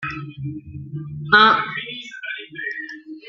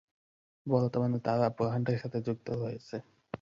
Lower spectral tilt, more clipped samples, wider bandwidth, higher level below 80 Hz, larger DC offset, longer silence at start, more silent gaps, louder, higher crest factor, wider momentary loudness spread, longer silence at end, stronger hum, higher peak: second, -5.5 dB/octave vs -9 dB/octave; neither; about the same, 7.4 kHz vs 7.4 kHz; first, -56 dBFS vs -66 dBFS; neither; second, 0 s vs 0.65 s; neither; first, -18 LUFS vs -32 LUFS; about the same, 20 dB vs 18 dB; first, 20 LU vs 14 LU; about the same, 0 s vs 0.05 s; neither; first, -2 dBFS vs -14 dBFS